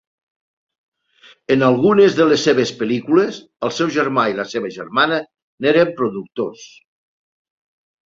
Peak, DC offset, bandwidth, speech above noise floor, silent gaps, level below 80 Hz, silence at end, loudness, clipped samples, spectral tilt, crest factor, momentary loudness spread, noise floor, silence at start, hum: -2 dBFS; under 0.1%; 7.8 kHz; 33 dB; 5.42-5.58 s; -62 dBFS; 1.45 s; -17 LUFS; under 0.1%; -5.5 dB/octave; 18 dB; 13 LU; -50 dBFS; 1.5 s; none